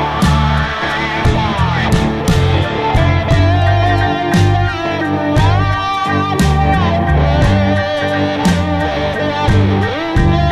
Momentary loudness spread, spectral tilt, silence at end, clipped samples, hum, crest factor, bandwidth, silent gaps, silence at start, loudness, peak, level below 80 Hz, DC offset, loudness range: 4 LU; -6.5 dB/octave; 0 s; under 0.1%; none; 10 dB; 13.5 kHz; none; 0 s; -14 LUFS; -2 dBFS; -22 dBFS; under 0.1%; 1 LU